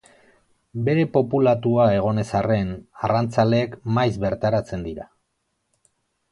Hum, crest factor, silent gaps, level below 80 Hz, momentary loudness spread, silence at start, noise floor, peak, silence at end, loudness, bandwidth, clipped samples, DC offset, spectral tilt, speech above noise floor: none; 18 dB; none; -48 dBFS; 12 LU; 0.75 s; -74 dBFS; -4 dBFS; 1.25 s; -21 LUFS; 11 kHz; under 0.1%; under 0.1%; -8 dB/octave; 53 dB